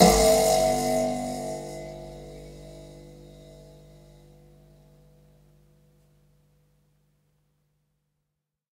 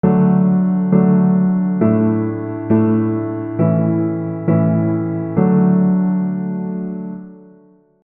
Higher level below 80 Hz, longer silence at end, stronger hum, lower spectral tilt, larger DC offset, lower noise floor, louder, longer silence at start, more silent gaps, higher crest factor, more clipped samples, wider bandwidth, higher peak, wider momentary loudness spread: first, -44 dBFS vs -54 dBFS; first, 5.75 s vs 0.65 s; first, 50 Hz at -55 dBFS vs none; second, -4 dB/octave vs -14.5 dB/octave; neither; first, -82 dBFS vs -49 dBFS; second, -24 LUFS vs -16 LUFS; about the same, 0 s vs 0.05 s; neither; first, 28 dB vs 14 dB; neither; first, 16 kHz vs 2.8 kHz; about the same, 0 dBFS vs -2 dBFS; first, 29 LU vs 10 LU